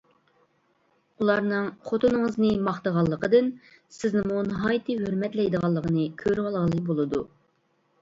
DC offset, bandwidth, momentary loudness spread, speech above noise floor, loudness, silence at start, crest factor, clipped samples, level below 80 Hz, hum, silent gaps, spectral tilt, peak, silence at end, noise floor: under 0.1%; 7.8 kHz; 6 LU; 44 dB; -26 LUFS; 1.2 s; 18 dB; under 0.1%; -56 dBFS; none; none; -7.5 dB/octave; -8 dBFS; 0.75 s; -69 dBFS